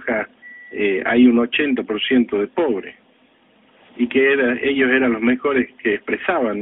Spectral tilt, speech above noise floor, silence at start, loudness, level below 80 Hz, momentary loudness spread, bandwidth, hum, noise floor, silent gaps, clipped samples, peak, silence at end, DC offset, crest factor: -2.5 dB/octave; 38 dB; 0 s; -18 LUFS; -56 dBFS; 10 LU; 4 kHz; none; -55 dBFS; none; under 0.1%; -4 dBFS; 0 s; under 0.1%; 16 dB